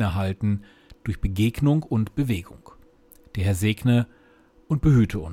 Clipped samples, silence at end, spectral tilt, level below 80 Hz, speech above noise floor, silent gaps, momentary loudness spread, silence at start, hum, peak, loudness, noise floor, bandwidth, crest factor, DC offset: under 0.1%; 0 s; -7 dB/octave; -40 dBFS; 33 dB; none; 11 LU; 0 s; none; -8 dBFS; -24 LUFS; -56 dBFS; 16.5 kHz; 16 dB; under 0.1%